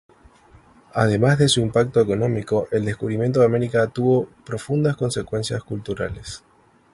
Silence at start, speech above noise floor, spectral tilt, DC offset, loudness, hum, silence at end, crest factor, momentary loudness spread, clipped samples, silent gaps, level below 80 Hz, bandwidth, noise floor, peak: 0.95 s; 31 dB; -6 dB/octave; under 0.1%; -21 LUFS; none; 0.55 s; 18 dB; 12 LU; under 0.1%; none; -48 dBFS; 11.5 kHz; -51 dBFS; -4 dBFS